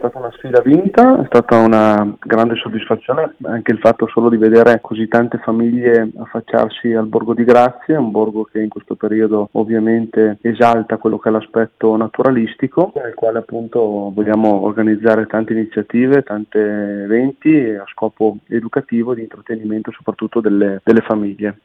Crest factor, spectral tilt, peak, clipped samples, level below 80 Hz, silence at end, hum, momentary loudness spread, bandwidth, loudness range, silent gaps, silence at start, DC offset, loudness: 14 dB; -8.5 dB/octave; 0 dBFS; under 0.1%; -54 dBFS; 0.1 s; none; 11 LU; 6.8 kHz; 4 LU; none; 0 s; under 0.1%; -15 LUFS